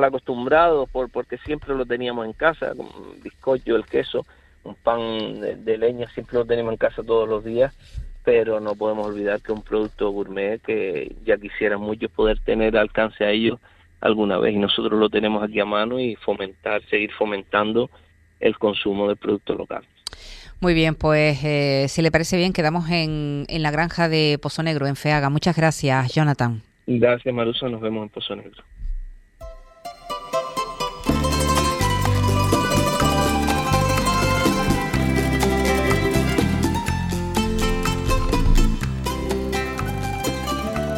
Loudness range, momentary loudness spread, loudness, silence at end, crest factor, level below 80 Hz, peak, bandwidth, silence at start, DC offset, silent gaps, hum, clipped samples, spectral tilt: 5 LU; 9 LU; -22 LUFS; 0 s; 20 dB; -32 dBFS; -2 dBFS; 16.5 kHz; 0 s; under 0.1%; none; none; under 0.1%; -5.5 dB/octave